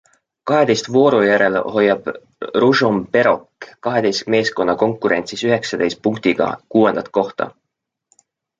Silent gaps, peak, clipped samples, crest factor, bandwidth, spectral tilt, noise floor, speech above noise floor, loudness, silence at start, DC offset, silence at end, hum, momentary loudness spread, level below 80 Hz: none; -2 dBFS; under 0.1%; 16 dB; 7.8 kHz; -5 dB/octave; -79 dBFS; 62 dB; -17 LUFS; 0.45 s; under 0.1%; 1.1 s; none; 9 LU; -58 dBFS